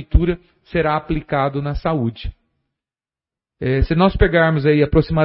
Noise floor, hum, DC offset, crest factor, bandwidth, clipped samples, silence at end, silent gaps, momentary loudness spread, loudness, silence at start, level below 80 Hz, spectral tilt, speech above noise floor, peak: under -90 dBFS; none; under 0.1%; 18 dB; 5.8 kHz; under 0.1%; 0 s; none; 11 LU; -18 LUFS; 0 s; -28 dBFS; -12 dB/octave; over 73 dB; -2 dBFS